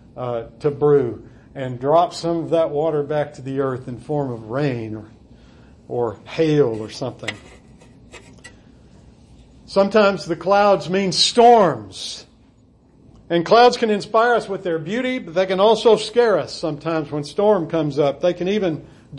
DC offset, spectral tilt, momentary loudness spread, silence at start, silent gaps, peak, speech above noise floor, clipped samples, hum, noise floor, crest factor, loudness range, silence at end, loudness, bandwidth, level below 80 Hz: under 0.1%; -5 dB/octave; 15 LU; 0.15 s; none; -4 dBFS; 34 dB; under 0.1%; none; -52 dBFS; 16 dB; 8 LU; 0 s; -19 LUFS; 11 kHz; -54 dBFS